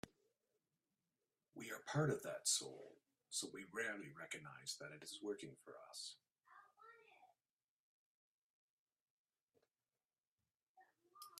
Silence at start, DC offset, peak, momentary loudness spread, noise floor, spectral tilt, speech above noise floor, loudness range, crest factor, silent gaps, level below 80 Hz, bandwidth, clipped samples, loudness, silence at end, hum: 0.05 s; under 0.1%; -24 dBFS; 24 LU; under -90 dBFS; -3 dB/octave; over 43 dB; 15 LU; 26 dB; 7.51-8.86 s, 9.01-9.25 s, 9.42-9.48 s, 10.20-10.38 s, 10.63-10.75 s; -88 dBFS; 15.5 kHz; under 0.1%; -46 LUFS; 0 s; none